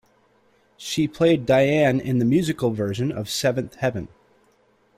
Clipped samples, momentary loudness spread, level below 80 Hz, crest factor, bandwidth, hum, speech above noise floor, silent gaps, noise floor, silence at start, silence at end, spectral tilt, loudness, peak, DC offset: under 0.1%; 9 LU; -54 dBFS; 16 dB; 16 kHz; none; 40 dB; none; -61 dBFS; 0.8 s; 0.9 s; -6 dB/octave; -22 LUFS; -8 dBFS; under 0.1%